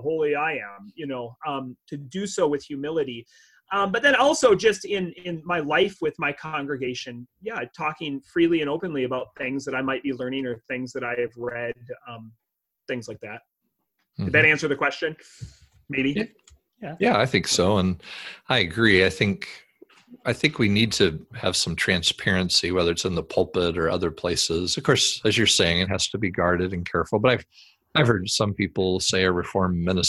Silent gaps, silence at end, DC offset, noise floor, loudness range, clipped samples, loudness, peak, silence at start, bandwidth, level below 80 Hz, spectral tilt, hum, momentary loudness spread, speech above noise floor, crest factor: none; 0 s; under 0.1%; -77 dBFS; 7 LU; under 0.1%; -23 LUFS; -2 dBFS; 0 s; 13 kHz; -46 dBFS; -4 dB/octave; none; 15 LU; 53 dB; 22 dB